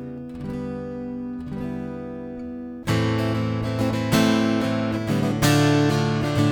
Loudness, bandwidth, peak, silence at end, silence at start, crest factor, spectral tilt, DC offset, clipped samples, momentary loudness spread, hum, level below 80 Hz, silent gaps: -23 LUFS; over 20 kHz; -6 dBFS; 0 s; 0 s; 18 dB; -6 dB/octave; under 0.1%; under 0.1%; 15 LU; none; -46 dBFS; none